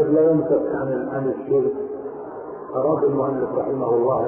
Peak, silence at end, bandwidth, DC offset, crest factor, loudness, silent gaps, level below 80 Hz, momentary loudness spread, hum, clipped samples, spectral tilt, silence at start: -8 dBFS; 0 s; 2.9 kHz; under 0.1%; 14 dB; -22 LUFS; none; -56 dBFS; 14 LU; none; under 0.1%; -14 dB/octave; 0 s